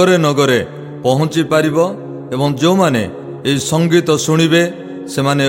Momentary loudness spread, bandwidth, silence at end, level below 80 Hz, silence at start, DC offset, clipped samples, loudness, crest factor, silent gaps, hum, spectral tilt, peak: 11 LU; 16.5 kHz; 0 s; -54 dBFS; 0 s; under 0.1%; under 0.1%; -14 LUFS; 14 dB; none; none; -5 dB/octave; 0 dBFS